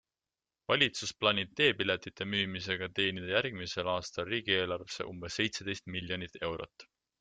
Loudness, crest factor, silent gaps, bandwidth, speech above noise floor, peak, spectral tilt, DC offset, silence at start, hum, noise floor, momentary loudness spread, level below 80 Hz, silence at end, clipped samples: -32 LUFS; 24 dB; none; 9.4 kHz; over 56 dB; -10 dBFS; -3.5 dB/octave; under 0.1%; 0.7 s; none; under -90 dBFS; 10 LU; -66 dBFS; 0.35 s; under 0.1%